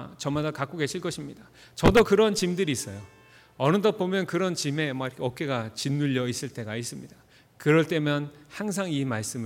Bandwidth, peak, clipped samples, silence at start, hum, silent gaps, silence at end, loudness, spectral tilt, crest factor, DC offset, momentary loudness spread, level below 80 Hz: 17 kHz; -8 dBFS; under 0.1%; 0 s; none; none; 0 s; -26 LUFS; -5 dB/octave; 18 dB; under 0.1%; 13 LU; -48 dBFS